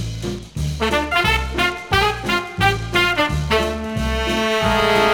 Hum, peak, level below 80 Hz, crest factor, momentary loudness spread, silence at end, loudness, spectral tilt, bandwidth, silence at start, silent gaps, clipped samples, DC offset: none; -2 dBFS; -30 dBFS; 16 dB; 8 LU; 0 s; -19 LUFS; -4.5 dB/octave; 19.5 kHz; 0 s; none; under 0.1%; under 0.1%